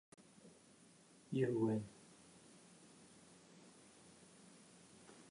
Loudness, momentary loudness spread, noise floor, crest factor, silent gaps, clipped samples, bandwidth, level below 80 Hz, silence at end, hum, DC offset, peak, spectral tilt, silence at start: -41 LUFS; 26 LU; -67 dBFS; 22 dB; none; under 0.1%; 11 kHz; -84 dBFS; 0.1 s; none; under 0.1%; -26 dBFS; -7 dB/octave; 0.45 s